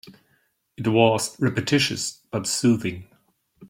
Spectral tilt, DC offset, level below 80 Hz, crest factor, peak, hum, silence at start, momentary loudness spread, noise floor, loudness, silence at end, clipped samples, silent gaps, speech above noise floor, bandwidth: -4.5 dB/octave; under 0.1%; -60 dBFS; 20 dB; -4 dBFS; none; 0.05 s; 10 LU; -67 dBFS; -22 LUFS; 0 s; under 0.1%; none; 45 dB; 16.5 kHz